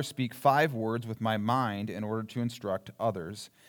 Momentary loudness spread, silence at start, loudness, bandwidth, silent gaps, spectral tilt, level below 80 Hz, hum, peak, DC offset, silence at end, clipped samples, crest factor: 10 LU; 0 s; -31 LUFS; over 20 kHz; none; -6 dB/octave; -76 dBFS; none; -10 dBFS; under 0.1%; 0.2 s; under 0.1%; 20 dB